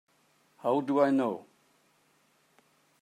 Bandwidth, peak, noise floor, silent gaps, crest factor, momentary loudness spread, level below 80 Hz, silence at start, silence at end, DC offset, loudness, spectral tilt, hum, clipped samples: 10.5 kHz; -12 dBFS; -68 dBFS; none; 20 dB; 10 LU; -86 dBFS; 0.65 s; 1.6 s; under 0.1%; -29 LUFS; -7.5 dB/octave; none; under 0.1%